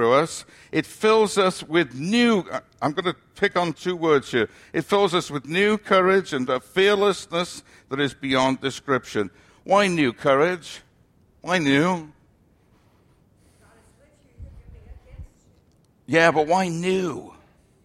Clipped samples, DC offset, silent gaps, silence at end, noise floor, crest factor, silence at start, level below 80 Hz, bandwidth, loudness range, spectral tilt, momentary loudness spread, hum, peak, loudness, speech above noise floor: under 0.1%; under 0.1%; none; 0.55 s; -59 dBFS; 20 dB; 0 s; -54 dBFS; 14.5 kHz; 6 LU; -5 dB/octave; 12 LU; none; -4 dBFS; -22 LUFS; 38 dB